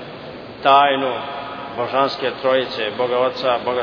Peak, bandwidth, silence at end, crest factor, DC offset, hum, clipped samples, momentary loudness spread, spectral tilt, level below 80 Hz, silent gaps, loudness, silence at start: 0 dBFS; 5.4 kHz; 0 s; 20 dB; under 0.1%; none; under 0.1%; 15 LU; -5.5 dB/octave; -58 dBFS; none; -19 LUFS; 0 s